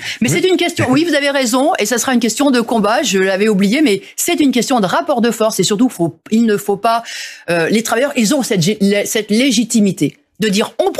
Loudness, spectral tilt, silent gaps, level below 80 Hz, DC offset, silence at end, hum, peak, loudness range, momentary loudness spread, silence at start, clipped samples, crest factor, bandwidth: -14 LUFS; -4 dB/octave; none; -56 dBFS; under 0.1%; 0 s; none; -2 dBFS; 2 LU; 4 LU; 0 s; under 0.1%; 12 dB; 15 kHz